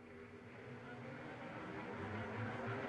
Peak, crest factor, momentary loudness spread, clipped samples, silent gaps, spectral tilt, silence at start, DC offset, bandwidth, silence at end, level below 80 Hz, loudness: -32 dBFS; 16 dB; 11 LU; under 0.1%; none; -7 dB/octave; 0 s; under 0.1%; 10.5 kHz; 0 s; -72 dBFS; -48 LUFS